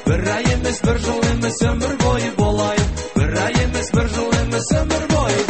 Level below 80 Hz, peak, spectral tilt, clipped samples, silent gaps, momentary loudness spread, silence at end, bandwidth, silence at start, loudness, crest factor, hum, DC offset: -26 dBFS; -4 dBFS; -5 dB/octave; under 0.1%; none; 1 LU; 0 s; 8.8 kHz; 0 s; -19 LUFS; 14 dB; none; 0.5%